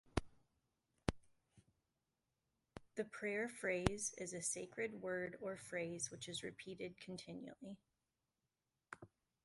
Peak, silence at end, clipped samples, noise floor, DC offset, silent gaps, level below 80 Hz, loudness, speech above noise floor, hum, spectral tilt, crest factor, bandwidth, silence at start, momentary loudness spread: -16 dBFS; 0.4 s; under 0.1%; under -90 dBFS; under 0.1%; none; -62 dBFS; -45 LUFS; over 44 dB; none; -4 dB/octave; 32 dB; 11.5 kHz; 0.05 s; 17 LU